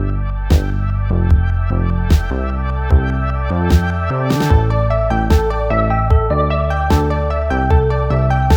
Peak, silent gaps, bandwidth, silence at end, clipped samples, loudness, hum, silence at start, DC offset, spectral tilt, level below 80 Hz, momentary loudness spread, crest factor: 0 dBFS; none; 17 kHz; 0 s; under 0.1%; -16 LUFS; none; 0 s; under 0.1%; -7.5 dB/octave; -18 dBFS; 5 LU; 14 dB